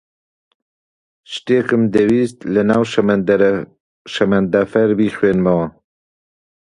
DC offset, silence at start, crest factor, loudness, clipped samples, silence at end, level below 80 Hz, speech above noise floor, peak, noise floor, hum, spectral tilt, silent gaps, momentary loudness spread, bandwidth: under 0.1%; 1.3 s; 16 dB; -16 LUFS; under 0.1%; 0.95 s; -50 dBFS; over 75 dB; 0 dBFS; under -90 dBFS; none; -7 dB/octave; 3.80-4.05 s; 11 LU; 10.5 kHz